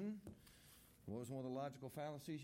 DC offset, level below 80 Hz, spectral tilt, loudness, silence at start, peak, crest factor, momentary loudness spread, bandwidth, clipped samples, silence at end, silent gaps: under 0.1%; -78 dBFS; -6.5 dB/octave; -50 LUFS; 0 s; -36 dBFS; 14 dB; 16 LU; 16.5 kHz; under 0.1%; 0 s; none